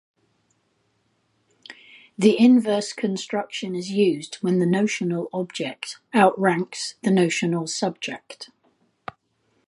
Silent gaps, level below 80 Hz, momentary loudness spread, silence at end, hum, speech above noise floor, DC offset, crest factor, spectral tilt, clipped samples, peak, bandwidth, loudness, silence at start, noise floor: none; -72 dBFS; 23 LU; 1.25 s; none; 47 dB; under 0.1%; 20 dB; -5.5 dB/octave; under 0.1%; -4 dBFS; 11.5 kHz; -22 LUFS; 1.7 s; -69 dBFS